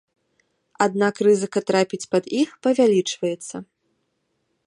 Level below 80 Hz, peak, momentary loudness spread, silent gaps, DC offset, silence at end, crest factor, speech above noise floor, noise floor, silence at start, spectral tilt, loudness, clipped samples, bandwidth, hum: -72 dBFS; -2 dBFS; 9 LU; none; under 0.1%; 1.05 s; 20 dB; 52 dB; -72 dBFS; 0.8 s; -5 dB/octave; -21 LUFS; under 0.1%; 11 kHz; none